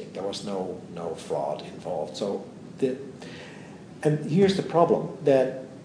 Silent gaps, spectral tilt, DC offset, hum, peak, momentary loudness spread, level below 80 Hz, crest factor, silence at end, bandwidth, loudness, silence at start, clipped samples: none; -6.5 dB/octave; under 0.1%; none; -6 dBFS; 19 LU; -66 dBFS; 22 dB; 0 s; 10.5 kHz; -27 LUFS; 0 s; under 0.1%